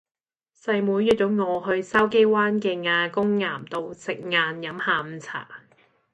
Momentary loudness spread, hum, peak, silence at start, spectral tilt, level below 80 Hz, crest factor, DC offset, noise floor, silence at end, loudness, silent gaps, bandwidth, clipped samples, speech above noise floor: 14 LU; none; -6 dBFS; 0.65 s; -5.5 dB/octave; -62 dBFS; 18 dB; under 0.1%; under -90 dBFS; 0.55 s; -23 LUFS; none; 10.5 kHz; under 0.1%; over 67 dB